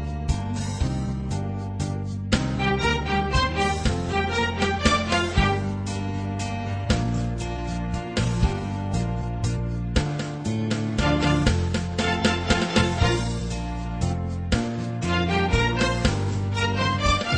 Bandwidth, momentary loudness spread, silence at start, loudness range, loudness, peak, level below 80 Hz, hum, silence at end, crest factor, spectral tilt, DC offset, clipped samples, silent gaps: 10 kHz; 7 LU; 0 s; 4 LU; -25 LUFS; -6 dBFS; -32 dBFS; none; 0 s; 18 dB; -5.5 dB/octave; under 0.1%; under 0.1%; none